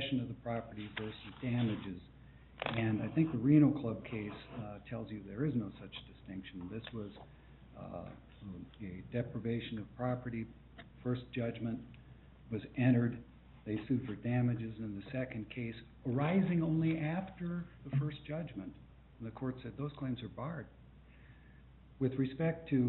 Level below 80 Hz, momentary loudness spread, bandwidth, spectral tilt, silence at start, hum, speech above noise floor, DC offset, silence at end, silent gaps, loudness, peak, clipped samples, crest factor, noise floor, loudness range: -60 dBFS; 17 LU; 4.2 kHz; -7 dB/octave; 0 s; none; 22 dB; under 0.1%; 0 s; none; -38 LUFS; -16 dBFS; under 0.1%; 22 dB; -58 dBFS; 10 LU